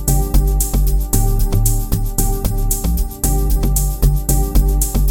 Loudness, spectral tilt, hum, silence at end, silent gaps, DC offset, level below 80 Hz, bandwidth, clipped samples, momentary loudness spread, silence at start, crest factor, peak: -18 LUFS; -5.5 dB/octave; none; 0 s; none; 0.4%; -16 dBFS; 17.5 kHz; under 0.1%; 3 LU; 0 s; 14 dB; 0 dBFS